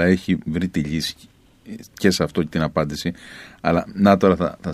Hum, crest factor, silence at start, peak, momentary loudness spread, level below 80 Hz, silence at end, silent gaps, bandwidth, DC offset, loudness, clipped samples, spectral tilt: none; 20 dB; 0 s; 0 dBFS; 21 LU; -44 dBFS; 0 s; none; 14.5 kHz; under 0.1%; -21 LUFS; under 0.1%; -6 dB/octave